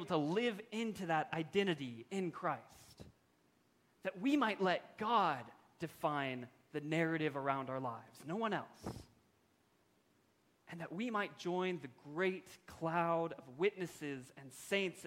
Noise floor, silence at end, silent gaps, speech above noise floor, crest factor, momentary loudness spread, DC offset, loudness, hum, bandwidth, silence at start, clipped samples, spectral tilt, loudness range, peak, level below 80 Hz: -75 dBFS; 0 s; none; 36 dB; 20 dB; 15 LU; under 0.1%; -39 LUFS; none; 16.5 kHz; 0 s; under 0.1%; -5.5 dB/octave; 7 LU; -20 dBFS; -76 dBFS